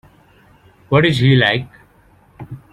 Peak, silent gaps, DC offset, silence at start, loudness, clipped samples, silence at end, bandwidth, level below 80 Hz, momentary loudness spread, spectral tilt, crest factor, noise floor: -2 dBFS; none; under 0.1%; 0.9 s; -14 LUFS; under 0.1%; 0.15 s; 10.5 kHz; -48 dBFS; 23 LU; -7 dB/octave; 16 dB; -51 dBFS